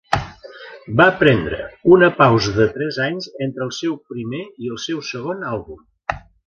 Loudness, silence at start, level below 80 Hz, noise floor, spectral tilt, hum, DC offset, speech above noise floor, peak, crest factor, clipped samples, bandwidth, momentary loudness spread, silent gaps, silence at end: -18 LUFS; 0.1 s; -44 dBFS; -39 dBFS; -6 dB/octave; none; under 0.1%; 21 dB; 0 dBFS; 18 dB; under 0.1%; 7.6 kHz; 17 LU; none; 0.3 s